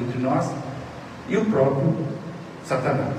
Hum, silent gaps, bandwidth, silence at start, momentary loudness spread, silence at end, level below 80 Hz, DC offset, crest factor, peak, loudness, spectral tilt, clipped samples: none; none; 11 kHz; 0 s; 16 LU; 0 s; -58 dBFS; under 0.1%; 16 dB; -8 dBFS; -24 LUFS; -7.5 dB/octave; under 0.1%